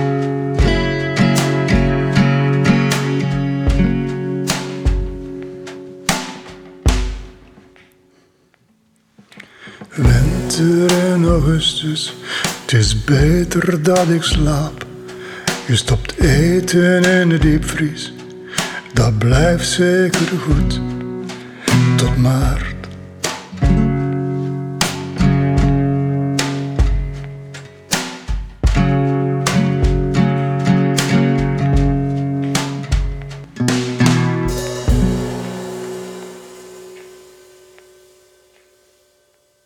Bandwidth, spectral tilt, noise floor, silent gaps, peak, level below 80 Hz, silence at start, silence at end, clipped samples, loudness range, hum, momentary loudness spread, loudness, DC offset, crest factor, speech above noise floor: 18 kHz; -5.5 dB/octave; -58 dBFS; none; -2 dBFS; -24 dBFS; 0 s; 2.55 s; under 0.1%; 8 LU; none; 16 LU; -16 LUFS; under 0.1%; 14 dB; 44 dB